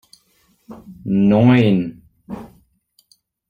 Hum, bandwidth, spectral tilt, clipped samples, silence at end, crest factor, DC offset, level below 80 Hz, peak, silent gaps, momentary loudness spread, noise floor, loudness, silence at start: none; 9.8 kHz; -9 dB/octave; under 0.1%; 1.05 s; 16 dB; under 0.1%; -52 dBFS; -2 dBFS; none; 23 LU; -60 dBFS; -15 LUFS; 0.7 s